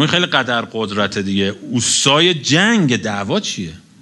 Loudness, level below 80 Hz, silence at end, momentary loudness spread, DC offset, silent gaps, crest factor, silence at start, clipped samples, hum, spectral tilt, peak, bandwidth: -15 LUFS; -54 dBFS; 0.2 s; 8 LU; under 0.1%; none; 16 dB; 0 s; under 0.1%; none; -3.5 dB/octave; 0 dBFS; 11.5 kHz